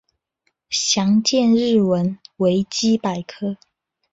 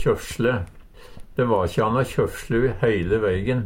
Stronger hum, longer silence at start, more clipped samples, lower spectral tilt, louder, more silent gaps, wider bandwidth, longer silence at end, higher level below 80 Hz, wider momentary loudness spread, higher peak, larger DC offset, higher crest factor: neither; first, 0.7 s vs 0 s; neither; second, -4.5 dB/octave vs -6.5 dB/octave; first, -19 LUFS vs -23 LUFS; neither; second, 8 kHz vs 16.5 kHz; first, 0.55 s vs 0 s; second, -60 dBFS vs -40 dBFS; first, 12 LU vs 5 LU; about the same, -6 dBFS vs -6 dBFS; neither; about the same, 14 dB vs 16 dB